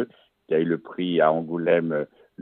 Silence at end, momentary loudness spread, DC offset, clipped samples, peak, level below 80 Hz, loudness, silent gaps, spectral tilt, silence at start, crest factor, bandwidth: 0 s; 9 LU; under 0.1%; under 0.1%; -6 dBFS; -74 dBFS; -24 LUFS; none; -10 dB/octave; 0 s; 18 dB; 4.1 kHz